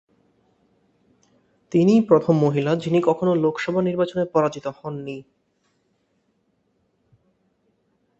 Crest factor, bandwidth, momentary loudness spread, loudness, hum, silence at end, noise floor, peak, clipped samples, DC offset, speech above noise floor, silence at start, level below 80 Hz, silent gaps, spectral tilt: 22 dB; 8 kHz; 15 LU; -21 LUFS; none; 3 s; -68 dBFS; -2 dBFS; under 0.1%; under 0.1%; 48 dB; 1.7 s; -64 dBFS; none; -8 dB/octave